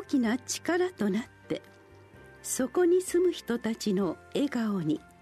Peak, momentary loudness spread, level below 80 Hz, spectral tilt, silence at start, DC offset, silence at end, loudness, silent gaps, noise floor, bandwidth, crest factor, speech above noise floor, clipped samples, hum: -16 dBFS; 11 LU; -64 dBFS; -5 dB/octave; 0 s; under 0.1%; 0.25 s; -29 LUFS; none; -53 dBFS; 13.5 kHz; 14 dB; 25 dB; under 0.1%; none